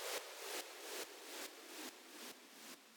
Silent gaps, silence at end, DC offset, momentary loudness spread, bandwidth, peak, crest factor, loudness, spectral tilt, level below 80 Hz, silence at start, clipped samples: none; 0 s; under 0.1%; 9 LU; 19.5 kHz; -32 dBFS; 18 dB; -49 LUFS; 0.5 dB/octave; under -90 dBFS; 0 s; under 0.1%